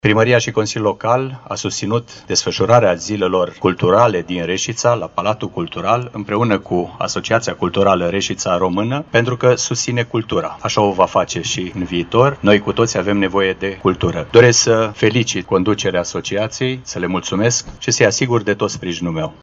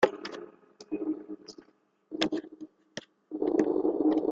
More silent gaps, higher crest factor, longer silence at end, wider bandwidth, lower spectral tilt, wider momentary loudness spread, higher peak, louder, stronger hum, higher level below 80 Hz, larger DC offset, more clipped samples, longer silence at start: neither; second, 16 dB vs 24 dB; about the same, 0.1 s vs 0 s; about the same, 8 kHz vs 8 kHz; about the same, -4.5 dB/octave vs -5 dB/octave; second, 9 LU vs 20 LU; first, 0 dBFS vs -8 dBFS; first, -16 LUFS vs -31 LUFS; neither; first, -46 dBFS vs -72 dBFS; neither; neither; about the same, 0.05 s vs 0 s